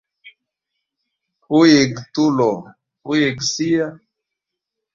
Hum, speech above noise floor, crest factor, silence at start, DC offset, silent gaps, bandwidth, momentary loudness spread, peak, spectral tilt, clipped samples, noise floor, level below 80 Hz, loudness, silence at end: none; 66 dB; 18 dB; 0.25 s; under 0.1%; none; 7.6 kHz; 13 LU; -2 dBFS; -4.5 dB/octave; under 0.1%; -82 dBFS; -58 dBFS; -17 LUFS; 1 s